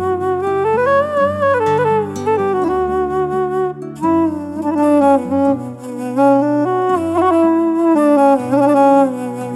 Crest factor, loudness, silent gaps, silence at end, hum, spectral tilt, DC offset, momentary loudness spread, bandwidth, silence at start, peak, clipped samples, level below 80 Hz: 12 dB; -15 LUFS; none; 0 s; none; -7.5 dB/octave; under 0.1%; 8 LU; 12.5 kHz; 0 s; -2 dBFS; under 0.1%; -50 dBFS